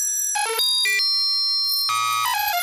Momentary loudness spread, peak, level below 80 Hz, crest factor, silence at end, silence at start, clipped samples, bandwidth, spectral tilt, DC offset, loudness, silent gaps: 3 LU; -10 dBFS; -66 dBFS; 12 dB; 0 s; 0 s; under 0.1%; 16 kHz; 3.5 dB/octave; under 0.1%; -19 LUFS; none